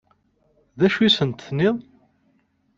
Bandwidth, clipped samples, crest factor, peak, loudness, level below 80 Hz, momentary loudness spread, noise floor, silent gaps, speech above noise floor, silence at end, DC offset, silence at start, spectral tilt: 7.6 kHz; under 0.1%; 18 dB; -4 dBFS; -20 LUFS; -58 dBFS; 8 LU; -65 dBFS; none; 45 dB; 0.95 s; under 0.1%; 0.75 s; -6 dB/octave